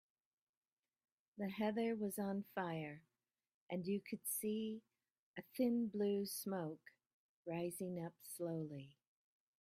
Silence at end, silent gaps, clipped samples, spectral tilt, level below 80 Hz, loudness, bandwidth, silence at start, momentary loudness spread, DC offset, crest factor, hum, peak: 0.7 s; 3.54-3.67 s, 5.11-5.34 s, 7.14-7.43 s; under 0.1%; -5.5 dB/octave; -86 dBFS; -43 LUFS; 16 kHz; 1.35 s; 16 LU; under 0.1%; 18 dB; none; -28 dBFS